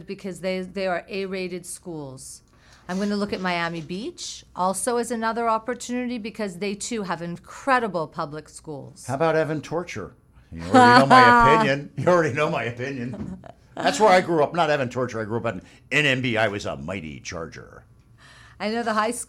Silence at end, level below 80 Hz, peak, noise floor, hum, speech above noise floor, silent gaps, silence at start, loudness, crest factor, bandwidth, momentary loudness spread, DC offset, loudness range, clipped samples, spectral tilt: 0.05 s; -50 dBFS; 0 dBFS; -51 dBFS; none; 28 dB; none; 0 s; -22 LUFS; 22 dB; 15 kHz; 19 LU; under 0.1%; 11 LU; under 0.1%; -4.5 dB/octave